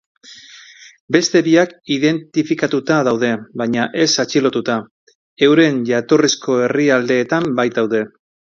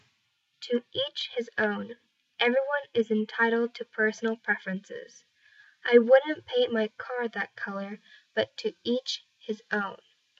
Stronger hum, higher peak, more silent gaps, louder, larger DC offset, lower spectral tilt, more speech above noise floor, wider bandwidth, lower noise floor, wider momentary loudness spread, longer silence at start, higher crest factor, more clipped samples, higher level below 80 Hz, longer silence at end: neither; first, 0 dBFS vs -6 dBFS; first, 1.00-1.08 s, 4.91-5.07 s, 5.15-5.37 s vs none; first, -16 LUFS vs -28 LUFS; neither; about the same, -4.5 dB/octave vs -4.5 dB/octave; second, 26 dB vs 46 dB; about the same, 7.6 kHz vs 7.6 kHz; second, -42 dBFS vs -74 dBFS; second, 7 LU vs 15 LU; second, 0.3 s vs 0.6 s; second, 16 dB vs 22 dB; neither; first, -60 dBFS vs -82 dBFS; about the same, 0.45 s vs 0.45 s